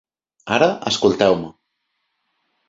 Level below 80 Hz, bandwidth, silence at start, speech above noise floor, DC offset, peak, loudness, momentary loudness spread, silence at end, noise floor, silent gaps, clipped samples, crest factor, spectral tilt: -54 dBFS; 7.8 kHz; 0.45 s; 56 dB; under 0.1%; -2 dBFS; -18 LUFS; 16 LU; 1.2 s; -73 dBFS; none; under 0.1%; 20 dB; -4.5 dB/octave